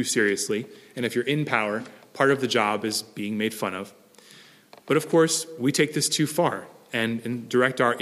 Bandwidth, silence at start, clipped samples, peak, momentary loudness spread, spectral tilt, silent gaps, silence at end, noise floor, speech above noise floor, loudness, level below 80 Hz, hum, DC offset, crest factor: 15.5 kHz; 0 s; under 0.1%; -4 dBFS; 10 LU; -4 dB/octave; none; 0 s; -51 dBFS; 27 dB; -24 LUFS; -74 dBFS; none; under 0.1%; 22 dB